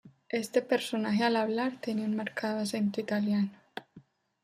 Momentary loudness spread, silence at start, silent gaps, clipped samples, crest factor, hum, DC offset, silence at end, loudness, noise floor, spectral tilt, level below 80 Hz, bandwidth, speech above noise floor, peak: 8 LU; 0.05 s; none; under 0.1%; 18 dB; none; under 0.1%; 0.45 s; -31 LUFS; -58 dBFS; -5.5 dB/octave; -78 dBFS; 15 kHz; 28 dB; -14 dBFS